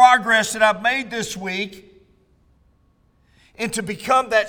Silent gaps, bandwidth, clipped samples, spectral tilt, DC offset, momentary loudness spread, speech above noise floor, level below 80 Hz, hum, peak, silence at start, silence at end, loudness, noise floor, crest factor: none; over 20 kHz; under 0.1%; -2.5 dB/octave; under 0.1%; 11 LU; 39 dB; -56 dBFS; none; 0 dBFS; 0 s; 0 s; -20 LUFS; -60 dBFS; 20 dB